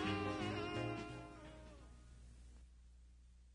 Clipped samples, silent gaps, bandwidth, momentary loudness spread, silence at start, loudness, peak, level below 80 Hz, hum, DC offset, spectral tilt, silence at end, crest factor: under 0.1%; none; 10 kHz; 24 LU; 0 s; -45 LUFS; -28 dBFS; -60 dBFS; 60 Hz at -60 dBFS; under 0.1%; -6 dB/octave; 0 s; 20 dB